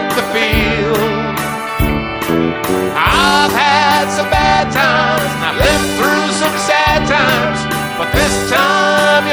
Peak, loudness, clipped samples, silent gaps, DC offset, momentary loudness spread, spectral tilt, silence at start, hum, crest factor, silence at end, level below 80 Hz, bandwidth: 0 dBFS; -13 LUFS; under 0.1%; none; under 0.1%; 6 LU; -4 dB/octave; 0 s; none; 14 dB; 0 s; -28 dBFS; over 20 kHz